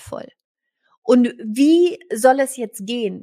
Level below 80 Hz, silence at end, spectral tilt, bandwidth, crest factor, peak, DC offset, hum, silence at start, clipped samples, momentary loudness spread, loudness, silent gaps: -64 dBFS; 0 s; -4.5 dB/octave; 15.5 kHz; 16 dB; -2 dBFS; under 0.1%; none; 0.05 s; under 0.1%; 15 LU; -18 LUFS; 0.44-0.55 s, 0.98-1.02 s